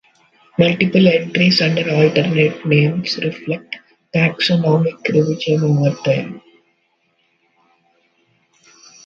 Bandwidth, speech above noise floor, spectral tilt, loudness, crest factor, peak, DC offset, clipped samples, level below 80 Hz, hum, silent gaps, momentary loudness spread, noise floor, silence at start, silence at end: 7.2 kHz; 48 dB; -6.5 dB/octave; -16 LUFS; 18 dB; 0 dBFS; under 0.1%; under 0.1%; -58 dBFS; none; none; 12 LU; -64 dBFS; 0.6 s; 2.65 s